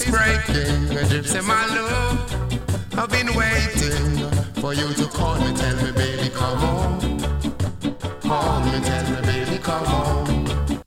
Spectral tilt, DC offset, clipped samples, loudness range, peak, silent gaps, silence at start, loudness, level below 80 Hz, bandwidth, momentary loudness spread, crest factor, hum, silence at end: -5 dB/octave; under 0.1%; under 0.1%; 2 LU; -6 dBFS; none; 0 s; -22 LUFS; -28 dBFS; 16.5 kHz; 6 LU; 16 dB; none; 0.05 s